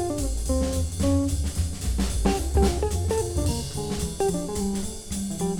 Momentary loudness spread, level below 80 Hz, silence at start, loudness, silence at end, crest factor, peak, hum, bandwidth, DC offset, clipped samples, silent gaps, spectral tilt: 6 LU; -30 dBFS; 0 s; -26 LUFS; 0 s; 16 dB; -8 dBFS; none; 19.5 kHz; under 0.1%; under 0.1%; none; -5.5 dB/octave